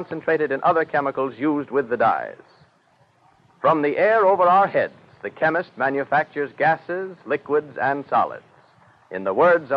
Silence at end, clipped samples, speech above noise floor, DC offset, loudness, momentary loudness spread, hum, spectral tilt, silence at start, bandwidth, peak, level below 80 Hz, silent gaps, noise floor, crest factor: 0 s; under 0.1%; 39 dB; under 0.1%; -21 LUFS; 12 LU; none; -8 dB/octave; 0 s; 5.8 kHz; -6 dBFS; -70 dBFS; none; -59 dBFS; 16 dB